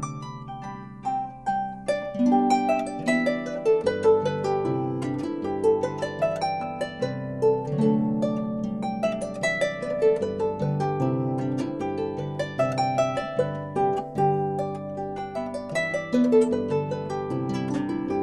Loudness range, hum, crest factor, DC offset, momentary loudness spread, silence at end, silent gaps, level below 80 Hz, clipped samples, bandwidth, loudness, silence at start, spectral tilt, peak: 3 LU; none; 16 dB; 0.1%; 9 LU; 0 s; none; -56 dBFS; under 0.1%; 11.5 kHz; -26 LUFS; 0 s; -7 dB/octave; -10 dBFS